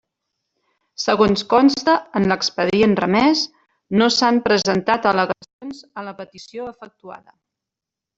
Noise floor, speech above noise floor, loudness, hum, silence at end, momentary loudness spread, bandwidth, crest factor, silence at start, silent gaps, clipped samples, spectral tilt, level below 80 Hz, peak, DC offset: -86 dBFS; 68 dB; -17 LUFS; none; 1 s; 19 LU; 8 kHz; 18 dB; 1 s; 5.53-5.59 s; under 0.1%; -4.5 dB/octave; -54 dBFS; -2 dBFS; under 0.1%